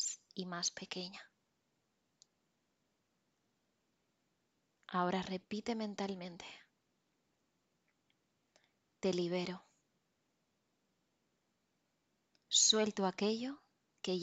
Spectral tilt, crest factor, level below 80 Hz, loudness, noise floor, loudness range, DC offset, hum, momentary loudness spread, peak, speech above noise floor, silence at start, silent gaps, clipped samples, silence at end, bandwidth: -2.5 dB/octave; 26 dB; -82 dBFS; -36 LUFS; -82 dBFS; 13 LU; under 0.1%; none; 19 LU; -16 dBFS; 45 dB; 0 s; none; under 0.1%; 0 s; 11 kHz